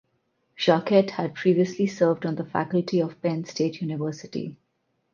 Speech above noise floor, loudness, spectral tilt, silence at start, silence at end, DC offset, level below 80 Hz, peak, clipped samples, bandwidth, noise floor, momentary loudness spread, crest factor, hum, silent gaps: 49 dB; -25 LUFS; -6.5 dB/octave; 0.6 s; 0.6 s; under 0.1%; -70 dBFS; -4 dBFS; under 0.1%; 7.2 kHz; -73 dBFS; 10 LU; 20 dB; none; none